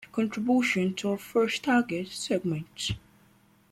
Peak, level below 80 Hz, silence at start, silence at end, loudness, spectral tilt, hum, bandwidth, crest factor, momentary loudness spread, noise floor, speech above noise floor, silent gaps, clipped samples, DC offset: -14 dBFS; -58 dBFS; 0 s; 0.75 s; -28 LUFS; -5 dB/octave; none; 14.5 kHz; 16 dB; 9 LU; -61 dBFS; 34 dB; none; under 0.1%; under 0.1%